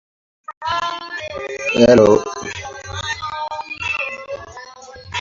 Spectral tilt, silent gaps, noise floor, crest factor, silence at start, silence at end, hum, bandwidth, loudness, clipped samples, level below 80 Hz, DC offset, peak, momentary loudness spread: -4.5 dB/octave; 0.57-0.61 s; -38 dBFS; 20 dB; 0.5 s; 0 s; none; 7.8 kHz; -18 LUFS; under 0.1%; -46 dBFS; under 0.1%; 0 dBFS; 24 LU